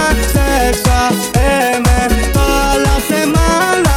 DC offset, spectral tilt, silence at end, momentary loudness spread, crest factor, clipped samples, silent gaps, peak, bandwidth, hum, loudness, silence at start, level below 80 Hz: under 0.1%; -4.5 dB/octave; 0 s; 2 LU; 12 dB; under 0.1%; none; 0 dBFS; 19 kHz; none; -12 LUFS; 0 s; -16 dBFS